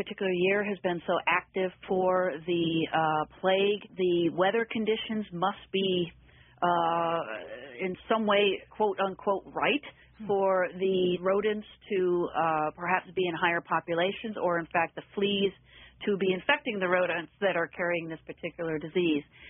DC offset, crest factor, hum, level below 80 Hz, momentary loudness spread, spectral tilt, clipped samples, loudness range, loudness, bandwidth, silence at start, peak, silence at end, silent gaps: under 0.1%; 20 dB; none; -66 dBFS; 7 LU; -1.5 dB/octave; under 0.1%; 2 LU; -29 LUFS; 3.8 kHz; 0 s; -10 dBFS; 0 s; none